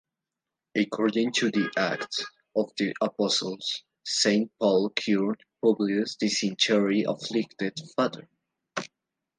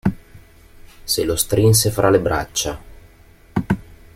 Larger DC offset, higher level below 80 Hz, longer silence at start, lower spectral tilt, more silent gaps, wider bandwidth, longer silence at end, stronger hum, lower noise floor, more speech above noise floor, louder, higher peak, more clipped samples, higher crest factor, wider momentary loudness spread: neither; second, -76 dBFS vs -40 dBFS; first, 0.75 s vs 0.05 s; about the same, -4 dB/octave vs -4.5 dB/octave; neither; second, 10 kHz vs 16.5 kHz; first, 0.55 s vs 0.2 s; neither; first, -88 dBFS vs -47 dBFS; first, 62 dB vs 30 dB; second, -27 LUFS vs -18 LUFS; second, -8 dBFS vs -2 dBFS; neither; about the same, 20 dB vs 18 dB; second, 9 LU vs 12 LU